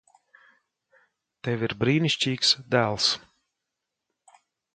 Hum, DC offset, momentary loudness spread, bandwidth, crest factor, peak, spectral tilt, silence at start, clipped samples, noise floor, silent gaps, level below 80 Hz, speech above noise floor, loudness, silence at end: none; under 0.1%; 10 LU; 9.4 kHz; 22 dB; -6 dBFS; -4 dB/octave; 1.45 s; under 0.1%; -84 dBFS; none; -62 dBFS; 60 dB; -24 LUFS; 1.55 s